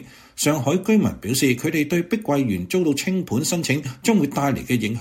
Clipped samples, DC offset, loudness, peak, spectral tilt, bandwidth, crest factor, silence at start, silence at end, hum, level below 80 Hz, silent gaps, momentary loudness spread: under 0.1%; under 0.1%; -21 LUFS; -4 dBFS; -5 dB/octave; 16.5 kHz; 16 dB; 0 s; 0 s; none; -52 dBFS; none; 4 LU